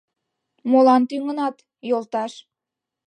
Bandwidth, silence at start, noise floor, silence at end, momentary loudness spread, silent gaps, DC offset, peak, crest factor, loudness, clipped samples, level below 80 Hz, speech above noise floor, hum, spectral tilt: 9.4 kHz; 0.65 s; -86 dBFS; 0.7 s; 17 LU; none; under 0.1%; -6 dBFS; 16 dB; -20 LUFS; under 0.1%; -80 dBFS; 66 dB; none; -5.5 dB/octave